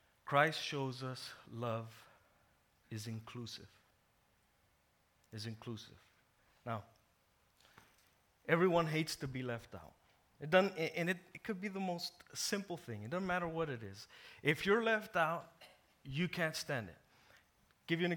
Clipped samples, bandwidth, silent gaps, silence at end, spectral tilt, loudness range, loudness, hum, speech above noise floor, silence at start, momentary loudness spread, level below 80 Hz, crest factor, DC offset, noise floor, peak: under 0.1%; 19 kHz; none; 0 s; -5 dB/octave; 14 LU; -38 LUFS; none; 37 dB; 0.25 s; 19 LU; -72 dBFS; 24 dB; under 0.1%; -75 dBFS; -16 dBFS